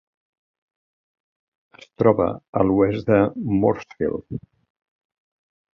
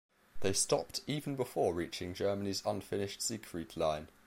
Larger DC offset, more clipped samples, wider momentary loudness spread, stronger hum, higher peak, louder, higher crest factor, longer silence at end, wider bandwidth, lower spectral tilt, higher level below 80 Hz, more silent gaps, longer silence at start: neither; neither; first, 10 LU vs 6 LU; neither; first, -2 dBFS vs -16 dBFS; first, -21 LUFS vs -36 LUFS; about the same, 20 dB vs 20 dB; first, 1.35 s vs 0 s; second, 6.6 kHz vs 16 kHz; first, -9.5 dB/octave vs -3.5 dB/octave; first, -50 dBFS vs -62 dBFS; first, 2.49-2.53 s vs none; first, 2 s vs 0.1 s